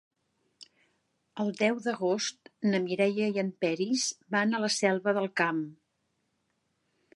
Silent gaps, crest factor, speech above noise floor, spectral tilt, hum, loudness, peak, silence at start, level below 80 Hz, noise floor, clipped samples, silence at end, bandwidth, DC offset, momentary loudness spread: none; 20 dB; 49 dB; -4 dB/octave; none; -29 LUFS; -10 dBFS; 0.6 s; -82 dBFS; -78 dBFS; under 0.1%; 1.4 s; 11.5 kHz; under 0.1%; 8 LU